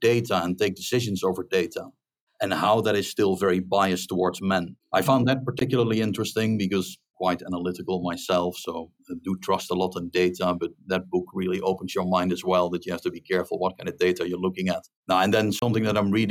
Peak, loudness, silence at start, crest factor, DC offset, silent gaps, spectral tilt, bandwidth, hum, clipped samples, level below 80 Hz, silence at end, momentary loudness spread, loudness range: -6 dBFS; -25 LUFS; 0 s; 18 dB; under 0.1%; 2.21-2.27 s, 14.96-15.03 s; -5.5 dB/octave; 19 kHz; none; under 0.1%; -62 dBFS; 0 s; 8 LU; 4 LU